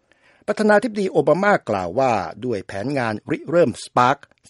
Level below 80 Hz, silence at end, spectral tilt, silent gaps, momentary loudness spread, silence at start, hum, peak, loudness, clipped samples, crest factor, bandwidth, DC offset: -60 dBFS; 0.35 s; -6 dB/octave; none; 9 LU; 0.5 s; none; 0 dBFS; -20 LUFS; under 0.1%; 20 dB; 11.5 kHz; under 0.1%